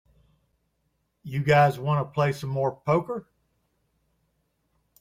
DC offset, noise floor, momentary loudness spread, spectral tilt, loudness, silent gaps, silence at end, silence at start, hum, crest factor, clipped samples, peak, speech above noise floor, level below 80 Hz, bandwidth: under 0.1%; -74 dBFS; 13 LU; -7 dB/octave; -25 LUFS; none; 1.8 s; 1.25 s; none; 20 dB; under 0.1%; -8 dBFS; 50 dB; -62 dBFS; 15.5 kHz